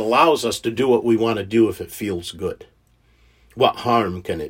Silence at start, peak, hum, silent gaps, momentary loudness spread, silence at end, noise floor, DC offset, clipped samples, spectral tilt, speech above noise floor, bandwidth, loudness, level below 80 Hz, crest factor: 0 s; 0 dBFS; none; none; 12 LU; 0 s; -58 dBFS; under 0.1%; under 0.1%; -5 dB/octave; 38 dB; 16.5 kHz; -20 LUFS; -54 dBFS; 20 dB